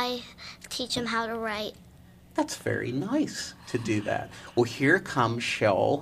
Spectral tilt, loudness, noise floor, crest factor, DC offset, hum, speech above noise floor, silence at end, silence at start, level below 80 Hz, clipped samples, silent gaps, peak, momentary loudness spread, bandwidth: -4.5 dB/octave; -28 LUFS; -52 dBFS; 20 dB; under 0.1%; none; 24 dB; 0 s; 0 s; -58 dBFS; under 0.1%; none; -8 dBFS; 12 LU; 15.5 kHz